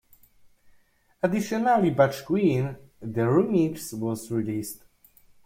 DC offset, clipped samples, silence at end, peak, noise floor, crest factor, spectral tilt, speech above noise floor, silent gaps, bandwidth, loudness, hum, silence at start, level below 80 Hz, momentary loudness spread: under 0.1%; under 0.1%; 0.7 s; -6 dBFS; -61 dBFS; 20 dB; -7 dB/octave; 37 dB; none; 16.5 kHz; -25 LUFS; none; 1.25 s; -60 dBFS; 12 LU